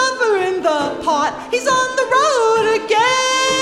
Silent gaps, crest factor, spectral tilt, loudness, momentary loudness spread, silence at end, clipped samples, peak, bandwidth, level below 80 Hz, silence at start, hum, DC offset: none; 14 dB; -1.5 dB/octave; -16 LUFS; 5 LU; 0 s; under 0.1%; -2 dBFS; 13.5 kHz; -52 dBFS; 0 s; none; under 0.1%